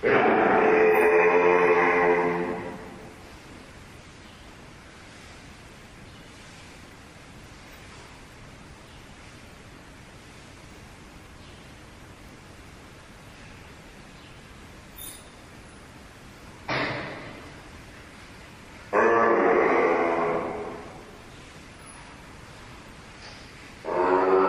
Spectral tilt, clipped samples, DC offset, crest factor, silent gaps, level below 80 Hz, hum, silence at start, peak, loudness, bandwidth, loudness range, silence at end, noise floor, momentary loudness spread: -5.5 dB/octave; under 0.1%; under 0.1%; 20 dB; none; -54 dBFS; none; 0 s; -6 dBFS; -22 LUFS; 15 kHz; 23 LU; 0 s; -47 dBFS; 26 LU